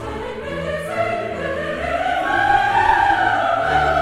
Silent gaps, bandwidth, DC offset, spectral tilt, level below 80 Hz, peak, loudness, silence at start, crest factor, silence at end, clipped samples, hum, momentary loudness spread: none; 13.5 kHz; under 0.1%; -5 dB/octave; -38 dBFS; -4 dBFS; -19 LUFS; 0 s; 16 dB; 0 s; under 0.1%; none; 10 LU